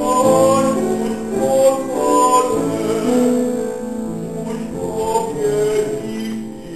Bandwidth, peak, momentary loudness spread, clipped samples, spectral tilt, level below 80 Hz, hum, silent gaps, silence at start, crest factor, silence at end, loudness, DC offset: 14 kHz; -2 dBFS; 12 LU; under 0.1%; -5 dB/octave; -48 dBFS; none; none; 0 s; 16 dB; 0 s; -17 LUFS; 0.7%